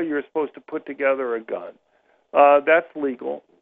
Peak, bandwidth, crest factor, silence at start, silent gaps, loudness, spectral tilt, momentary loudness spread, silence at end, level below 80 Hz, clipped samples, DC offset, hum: -4 dBFS; 3.9 kHz; 18 dB; 0 s; none; -21 LUFS; -8 dB/octave; 17 LU; 0.25 s; -70 dBFS; under 0.1%; under 0.1%; none